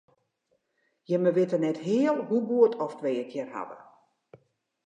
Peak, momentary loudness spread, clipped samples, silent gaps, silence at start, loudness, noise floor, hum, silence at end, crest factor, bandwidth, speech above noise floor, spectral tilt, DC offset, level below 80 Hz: -8 dBFS; 12 LU; under 0.1%; none; 1.1 s; -27 LUFS; -75 dBFS; none; 1.1 s; 20 dB; 9.2 kHz; 49 dB; -7.5 dB/octave; under 0.1%; -84 dBFS